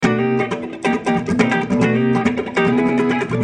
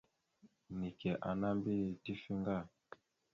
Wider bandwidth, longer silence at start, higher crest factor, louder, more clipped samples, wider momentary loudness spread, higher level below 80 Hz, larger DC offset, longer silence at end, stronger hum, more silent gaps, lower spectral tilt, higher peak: first, 9.8 kHz vs 7 kHz; second, 0 s vs 0.45 s; about the same, 16 dB vs 16 dB; first, -18 LUFS vs -40 LUFS; neither; second, 4 LU vs 20 LU; first, -50 dBFS vs -66 dBFS; neither; second, 0 s vs 0.4 s; neither; neither; about the same, -6.5 dB/octave vs -7 dB/octave; first, -2 dBFS vs -24 dBFS